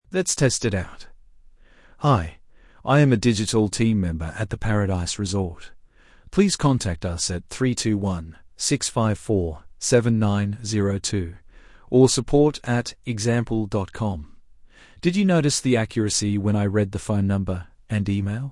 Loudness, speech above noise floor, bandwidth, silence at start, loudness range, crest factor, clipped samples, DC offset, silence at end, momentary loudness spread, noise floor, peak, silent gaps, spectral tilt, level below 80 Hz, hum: -22 LUFS; 29 dB; 12 kHz; 0.1 s; 2 LU; 18 dB; under 0.1%; under 0.1%; 0 s; 10 LU; -51 dBFS; -4 dBFS; none; -5.5 dB/octave; -44 dBFS; none